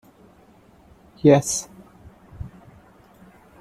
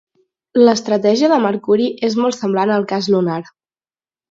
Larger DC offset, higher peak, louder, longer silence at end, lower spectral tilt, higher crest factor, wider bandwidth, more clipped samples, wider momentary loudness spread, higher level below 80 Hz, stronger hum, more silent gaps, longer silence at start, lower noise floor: neither; about the same, -2 dBFS vs 0 dBFS; second, -19 LUFS vs -16 LUFS; first, 1.15 s vs 0.9 s; about the same, -5.5 dB/octave vs -5.5 dB/octave; first, 24 dB vs 16 dB; first, 15 kHz vs 7.8 kHz; neither; first, 24 LU vs 5 LU; first, -52 dBFS vs -64 dBFS; neither; neither; first, 1.25 s vs 0.55 s; second, -53 dBFS vs under -90 dBFS